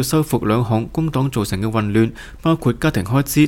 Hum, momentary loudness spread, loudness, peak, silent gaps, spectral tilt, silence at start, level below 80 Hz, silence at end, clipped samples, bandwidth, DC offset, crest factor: none; 3 LU; -19 LUFS; -2 dBFS; none; -6 dB/octave; 0 s; -38 dBFS; 0 s; under 0.1%; 17 kHz; under 0.1%; 14 dB